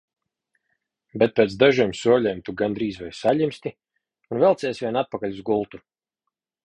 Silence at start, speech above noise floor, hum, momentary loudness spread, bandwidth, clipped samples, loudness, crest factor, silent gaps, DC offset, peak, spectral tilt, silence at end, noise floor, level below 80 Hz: 1.15 s; 61 dB; none; 13 LU; 10.5 kHz; under 0.1%; -22 LUFS; 20 dB; none; under 0.1%; -2 dBFS; -6 dB/octave; 0.85 s; -83 dBFS; -58 dBFS